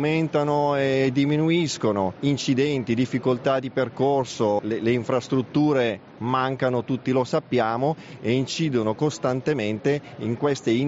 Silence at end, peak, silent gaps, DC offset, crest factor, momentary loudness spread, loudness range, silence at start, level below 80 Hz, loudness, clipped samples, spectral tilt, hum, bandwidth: 0 s; -8 dBFS; none; under 0.1%; 14 dB; 4 LU; 2 LU; 0 s; -62 dBFS; -23 LUFS; under 0.1%; -5.5 dB/octave; none; 8 kHz